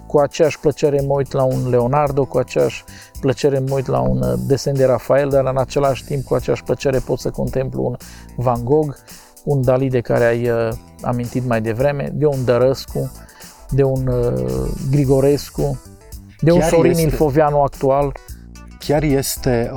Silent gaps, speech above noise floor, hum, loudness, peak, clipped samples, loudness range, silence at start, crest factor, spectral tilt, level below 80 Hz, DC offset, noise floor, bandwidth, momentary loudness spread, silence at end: none; 20 dB; none; -18 LUFS; 0 dBFS; under 0.1%; 3 LU; 0 s; 16 dB; -6.5 dB/octave; -34 dBFS; under 0.1%; -37 dBFS; 19 kHz; 9 LU; 0 s